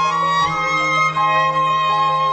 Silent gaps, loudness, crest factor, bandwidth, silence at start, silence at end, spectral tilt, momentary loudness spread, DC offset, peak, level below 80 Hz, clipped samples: none; -16 LUFS; 12 dB; 9 kHz; 0 s; 0 s; -3.5 dB/octave; 2 LU; under 0.1%; -6 dBFS; -52 dBFS; under 0.1%